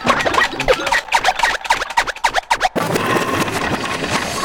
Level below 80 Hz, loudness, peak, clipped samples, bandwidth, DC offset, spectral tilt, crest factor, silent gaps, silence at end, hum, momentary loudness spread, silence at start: -38 dBFS; -17 LUFS; -2 dBFS; under 0.1%; 19.5 kHz; under 0.1%; -3 dB/octave; 16 dB; none; 0 s; none; 4 LU; 0 s